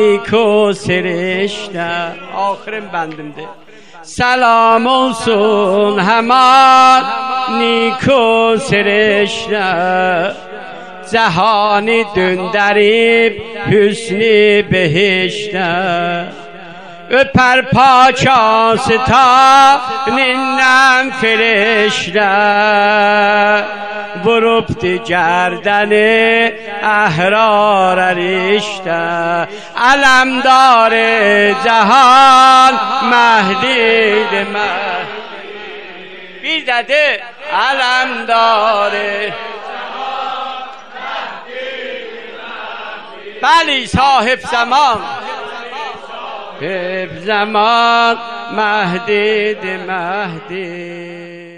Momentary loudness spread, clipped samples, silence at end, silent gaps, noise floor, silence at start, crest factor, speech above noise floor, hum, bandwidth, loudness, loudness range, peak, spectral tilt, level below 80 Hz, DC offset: 17 LU; under 0.1%; 0 s; none; -32 dBFS; 0 s; 12 dB; 21 dB; none; 12 kHz; -11 LUFS; 8 LU; 0 dBFS; -4 dB/octave; -46 dBFS; 0.9%